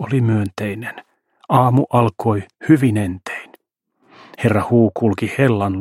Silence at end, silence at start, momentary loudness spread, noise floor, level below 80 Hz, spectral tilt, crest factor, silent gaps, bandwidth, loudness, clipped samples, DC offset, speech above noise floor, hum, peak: 0 s; 0 s; 13 LU; -66 dBFS; -54 dBFS; -8 dB/octave; 18 dB; none; 14 kHz; -17 LUFS; under 0.1%; under 0.1%; 49 dB; none; 0 dBFS